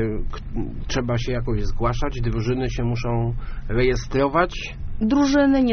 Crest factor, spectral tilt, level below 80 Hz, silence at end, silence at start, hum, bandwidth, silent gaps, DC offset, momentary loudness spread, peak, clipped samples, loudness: 16 dB; -6 dB/octave; -28 dBFS; 0 s; 0 s; none; 6.6 kHz; none; under 0.1%; 13 LU; -4 dBFS; under 0.1%; -23 LUFS